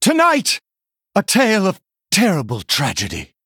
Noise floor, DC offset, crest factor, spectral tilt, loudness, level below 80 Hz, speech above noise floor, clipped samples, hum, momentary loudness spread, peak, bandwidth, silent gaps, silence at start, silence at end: -86 dBFS; under 0.1%; 16 dB; -3.5 dB/octave; -17 LUFS; -52 dBFS; 70 dB; under 0.1%; none; 9 LU; -2 dBFS; 20 kHz; none; 0 s; 0.2 s